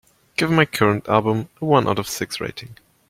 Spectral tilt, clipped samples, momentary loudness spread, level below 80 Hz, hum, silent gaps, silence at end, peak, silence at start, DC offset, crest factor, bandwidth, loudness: -5.5 dB/octave; under 0.1%; 11 LU; -54 dBFS; none; none; 0.35 s; -2 dBFS; 0.4 s; under 0.1%; 20 dB; 16.5 kHz; -20 LUFS